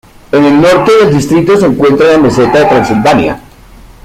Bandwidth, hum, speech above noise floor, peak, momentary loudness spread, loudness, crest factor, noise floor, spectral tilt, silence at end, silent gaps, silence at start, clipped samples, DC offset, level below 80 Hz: 15.5 kHz; none; 28 dB; 0 dBFS; 5 LU; -7 LUFS; 8 dB; -34 dBFS; -6 dB/octave; 0.65 s; none; 0.3 s; under 0.1%; under 0.1%; -36 dBFS